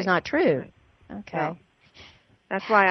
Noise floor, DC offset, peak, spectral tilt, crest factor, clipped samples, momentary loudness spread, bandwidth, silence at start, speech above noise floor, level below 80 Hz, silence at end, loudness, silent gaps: -52 dBFS; under 0.1%; -6 dBFS; -6.5 dB/octave; 20 dB; under 0.1%; 21 LU; 6.4 kHz; 0 s; 29 dB; -62 dBFS; 0 s; -25 LUFS; none